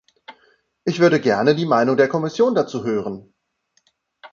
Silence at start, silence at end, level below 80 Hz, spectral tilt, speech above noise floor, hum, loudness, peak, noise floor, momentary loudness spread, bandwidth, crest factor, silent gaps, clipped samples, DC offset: 0.3 s; 0.05 s; -64 dBFS; -6.5 dB/octave; 49 dB; none; -18 LUFS; -2 dBFS; -67 dBFS; 11 LU; 7.4 kHz; 18 dB; none; under 0.1%; under 0.1%